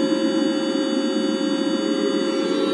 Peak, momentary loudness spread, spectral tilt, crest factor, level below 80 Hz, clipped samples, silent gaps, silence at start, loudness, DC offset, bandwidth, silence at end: -8 dBFS; 2 LU; -4.5 dB/octave; 12 dB; -78 dBFS; under 0.1%; none; 0 s; -22 LUFS; under 0.1%; 11.5 kHz; 0 s